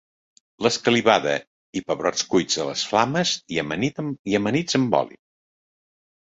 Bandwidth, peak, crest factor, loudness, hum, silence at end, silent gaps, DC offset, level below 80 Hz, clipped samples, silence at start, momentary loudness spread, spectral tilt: 8.2 kHz; -2 dBFS; 22 dB; -22 LUFS; none; 1.2 s; 1.47-1.73 s, 4.19-4.25 s; under 0.1%; -60 dBFS; under 0.1%; 0.6 s; 9 LU; -4 dB/octave